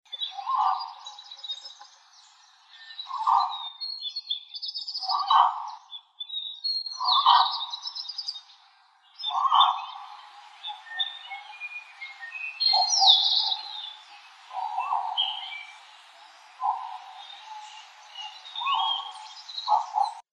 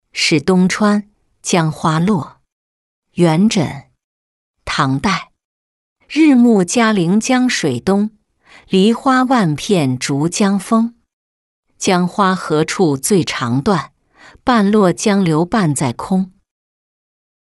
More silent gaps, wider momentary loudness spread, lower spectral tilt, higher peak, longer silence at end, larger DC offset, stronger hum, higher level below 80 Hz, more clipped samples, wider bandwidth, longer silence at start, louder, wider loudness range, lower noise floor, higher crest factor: second, none vs 2.52-3.02 s, 4.04-4.54 s, 5.45-5.96 s, 11.13-11.63 s; first, 22 LU vs 9 LU; second, 7.5 dB/octave vs -5 dB/octave; about the same, -4 dBFS vs -2 dBFS; second, 0.1 s vs 1.1 s; neither; neither; second, under -90 dBFS vs -50 dBFS; neither; second, 10 kHz vs 12 kHz; about the same, 0.1 s vs 0.15 s; second, -25 LUFS vs -15 LUFS; first, 9 LU vs 4 LU; first, -59 dBFS vs -45 dBFS; first, 26 dB vs 14 dB